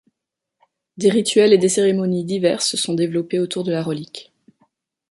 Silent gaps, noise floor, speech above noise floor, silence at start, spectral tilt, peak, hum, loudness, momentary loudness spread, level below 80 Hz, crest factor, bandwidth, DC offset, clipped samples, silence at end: none; -83 dBFS; 65 dB; 0.95 s; -4.5 dB/octave; -2 dBFS; none; -18 LUFS; 11 LU; -64 dBFS; 18 dB; 11.5 kHz; under 0.1%; under 0.1%; 0.9 s